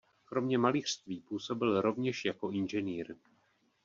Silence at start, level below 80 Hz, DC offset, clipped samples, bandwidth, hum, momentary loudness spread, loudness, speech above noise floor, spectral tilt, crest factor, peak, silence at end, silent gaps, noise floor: 0.3 s; -74 dBFS; under 0.1%; under 0.1%; 7.6 kHz; none; 11 LU; -34 LUFS; 39 dB; -4.5 dB/octave; 20 dB; -14 dBFS; 0.7 s; none; -73 dBFS